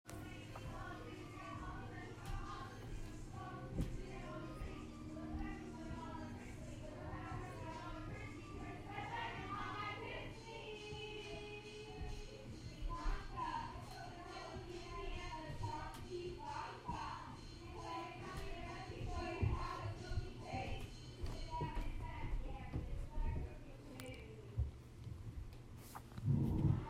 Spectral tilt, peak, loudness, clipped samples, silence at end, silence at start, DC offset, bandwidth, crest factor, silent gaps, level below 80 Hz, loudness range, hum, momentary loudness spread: -6 dB/octave; -24 dBFS; -48 LUFS; under 0.1%; 0 s; 0.05 s; under 0.1%; 15.5 kHz; 20 dB; none; -50 dBFS; 4 LU; none; 7 LU